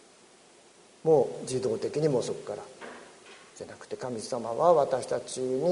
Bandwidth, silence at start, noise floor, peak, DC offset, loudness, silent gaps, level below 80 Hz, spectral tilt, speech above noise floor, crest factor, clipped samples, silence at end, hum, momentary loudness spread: 11 kHz; 1.05 s; -57 dBFS; -10 dBFS; under 0.1%; -28 LUFS; none; -70 dBFS; -5.5 dB/octave; 29 dB; 20 dB; under 0.1%; 0 s; none; 21 LU